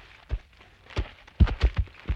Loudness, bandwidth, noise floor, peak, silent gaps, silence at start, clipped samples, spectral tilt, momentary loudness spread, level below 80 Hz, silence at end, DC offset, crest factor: -29 LUFS; 7 kHz; -54 dBFS; -6 dBFS; none; 0.3 s; under 0.1%; -7.5 dB/octave; 14 LU; -30 dBFS; 0 s; under 0.1%; 20 dB